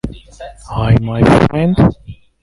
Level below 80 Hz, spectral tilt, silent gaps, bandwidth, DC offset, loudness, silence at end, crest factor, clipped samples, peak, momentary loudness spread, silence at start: -28 dBFS; -8 dB/octave; none; 11.5 kHz; under 0.1%; -12 LUFS; 0.3 s; 14 dB; under 0.1%; 0 dBFS; 23 LU; 0.05 s